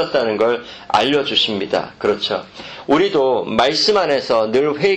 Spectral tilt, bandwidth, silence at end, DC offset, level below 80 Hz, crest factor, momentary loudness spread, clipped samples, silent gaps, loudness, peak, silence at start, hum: -4 dB/octave; 8.8 kHz; 0 s; under 0.1%; -54 dBFS; 16 dB; 7 LU; under 0.1%; none; -17 LUFS; -2 dBFS; 0 s; none